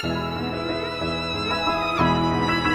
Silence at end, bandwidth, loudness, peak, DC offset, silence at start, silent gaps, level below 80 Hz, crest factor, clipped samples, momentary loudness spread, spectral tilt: 0 s; 15.5 kHz; -23 LUFS; -6 dBFS; under 0.1%; 0 s; none; -42 dBFS; 18 dB; under 0.1%; 6 LU; -5.5 dB/octave